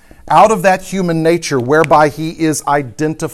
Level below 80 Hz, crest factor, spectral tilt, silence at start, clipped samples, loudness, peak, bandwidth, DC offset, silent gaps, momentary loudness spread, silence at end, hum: -42 dBFS; 12 dB; -5 dB/octave; 0.25 s; 0.1%; -13 LUFS; 0 dBFS; 15.5 kHz; under 0.1%; none; 8 LU; 0 s; none